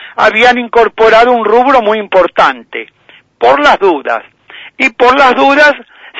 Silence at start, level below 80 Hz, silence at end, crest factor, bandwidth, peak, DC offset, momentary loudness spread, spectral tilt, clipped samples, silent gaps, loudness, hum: 0 s; -44 dBFS; 0 s; 8 dB; 11 kHz; 0 dBFS; under 0.1%; 11 LU; -3.5 dB/octave; 1%; none; -8 LUFS; none